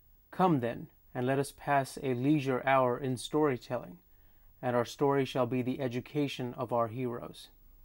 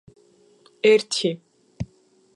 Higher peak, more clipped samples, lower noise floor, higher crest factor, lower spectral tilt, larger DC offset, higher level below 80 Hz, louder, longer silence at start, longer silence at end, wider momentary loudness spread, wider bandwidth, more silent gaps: second, -14 dBFS vs -4 dBFS; neither; about the same, -59 dBFS vs -59 dBFS; about the same, 18 dB vs 20 dB; first, -6.5 dB/octave vs -4 dB/octave; neither; second, -62 dBFS vs -54 dBFS; second, -32 LUFS vs -20 LUFS; second, 0.3 s vs 0.85 s; about the same, 0.4 s vs 0.5 s; second, 12 LU vs 18 LU; first, 16.5 kHz vs 11.5 kHz; neither